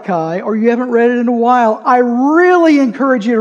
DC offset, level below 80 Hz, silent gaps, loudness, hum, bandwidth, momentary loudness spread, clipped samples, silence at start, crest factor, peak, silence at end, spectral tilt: under 0.1%; -70 dBFS; none; -11 LUFS; none; 7.6 kHz; 6 LU; under 0.1%; 0 s; 10 dB; 0 dBFS; 0 s; -6.5 dB/octave